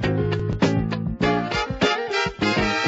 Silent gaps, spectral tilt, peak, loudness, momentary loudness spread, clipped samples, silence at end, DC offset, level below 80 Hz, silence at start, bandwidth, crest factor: none; -5.5 dB/octave; -6 dBFS; -22 LUFS; 3 LU; under 0.1%; 0 s; under 0.1%; -38 dBFS; 0 s; 8 kHz; 16 dB